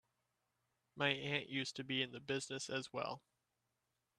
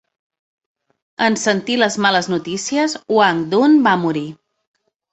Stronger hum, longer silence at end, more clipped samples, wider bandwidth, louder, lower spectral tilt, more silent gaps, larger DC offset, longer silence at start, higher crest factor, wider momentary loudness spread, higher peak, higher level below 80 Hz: neither; first, 1 s vs 0.8 s; neither; first, 12.5 kHz vs 8.4 kHz; second, -41 LUFS vs -16 LUFS; about the same, -3.5 dB/octave vs -4 dB/octave; neither; neither; second, 0.95 s vs 1.2 s; first, 26 dB vs 18 dB; about the same, 7 LU vs 9 LU; second, -18 dBFS vs 0 dBFS; second, -82 dBFS vs -62 dBFS